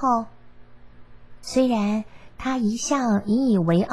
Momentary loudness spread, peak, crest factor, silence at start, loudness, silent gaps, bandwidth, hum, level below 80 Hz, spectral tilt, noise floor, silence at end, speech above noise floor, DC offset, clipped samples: 14 LU; -8 dBFS; 16 dB; 0 s; -23 LUFS; none; 12 kHz; none; -52 dBFS; -6 dB/octave; -47 dBFS; 0 s; 26 dB; 0.5%; under 0.1%